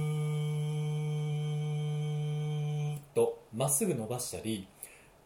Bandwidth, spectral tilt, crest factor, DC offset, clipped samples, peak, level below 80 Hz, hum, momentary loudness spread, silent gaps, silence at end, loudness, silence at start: over 20 kHz; -5.5 dB/octave; 16 dB; under 0.1%; under 0.1%; -16 dBFS; -68 dBFS; none; 8 LU; none; 0.25 s; -33 LUFS; 0 s